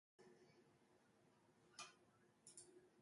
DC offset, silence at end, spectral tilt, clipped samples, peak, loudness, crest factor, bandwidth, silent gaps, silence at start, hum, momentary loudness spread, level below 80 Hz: under 0.1%; 0 s; -2 dB/octave; under 0.1%; -44 dBFS; -63 LUFS; 26 dB; 11.5 kHz; none; 0.2 s; none; 8 LU; under -90 dBFS